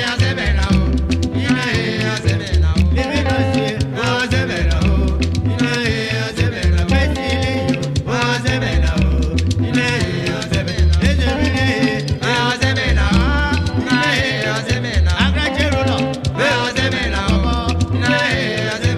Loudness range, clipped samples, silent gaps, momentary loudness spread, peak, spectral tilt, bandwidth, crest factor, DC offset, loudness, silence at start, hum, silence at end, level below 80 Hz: 1 LU; under 0.1%; none; 3 LU; -2 dBFS; -5.5 dB/octave; 12.5 kHz; 14 dB; under 0.1%; -17 LUFS; 0 s; none; 0 s; -24 dBFS